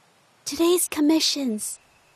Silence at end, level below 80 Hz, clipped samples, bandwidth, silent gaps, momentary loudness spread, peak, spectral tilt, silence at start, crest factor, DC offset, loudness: 0.4 s; -64 dBFS; under 0.1%; 15.5 kHz; none; 14 LU; -8 dBFS; -2 dB/octave; 0.45 s; 16 dB; under 0.1%; -22 LUFS